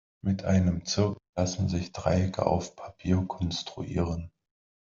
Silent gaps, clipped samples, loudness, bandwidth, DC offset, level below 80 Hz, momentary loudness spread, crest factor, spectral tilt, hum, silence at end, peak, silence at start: 1.29-1.33 s; under 0.1%; -29 LUFS; 7.6 kHz; under 0.1%; -52 dBFS; 8 LU; 20 dB; -6 dB/octave; none; 0.6 s; -8 dBFS; 0.25 s